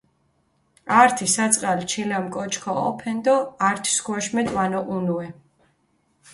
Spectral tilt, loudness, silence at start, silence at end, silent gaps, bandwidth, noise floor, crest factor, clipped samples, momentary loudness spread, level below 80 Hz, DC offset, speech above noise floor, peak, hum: -3.5 dB/octave; -22 LUFS; 0.85 s; 1 s; none; 12 kHz; -66 dBFS; 22 dB; under 0.1%; 10 LU; -60 dBFS; under 0.1%; 45 dB; -2 dBFS; none